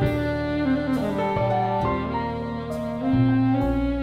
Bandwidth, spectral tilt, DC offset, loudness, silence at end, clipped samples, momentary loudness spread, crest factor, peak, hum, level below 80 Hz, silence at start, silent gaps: 11 kHz; -8.5 dB/octave; under 0.1%; -24 LUFS; 0 s; under 0.1%; 8 LU; 14 dB; -10 dBFS; none; -38 dBFS; 0 s; none